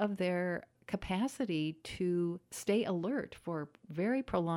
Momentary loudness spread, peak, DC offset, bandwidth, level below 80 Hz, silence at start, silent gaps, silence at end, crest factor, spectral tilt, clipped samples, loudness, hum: 8 LU; -20 dBFS; under 0.1%; 16 kHz; -62 dBFS; 0 s; none; 0 s; 16 dB; -6 dB/octave; under 0.1%; -36 LUFS; none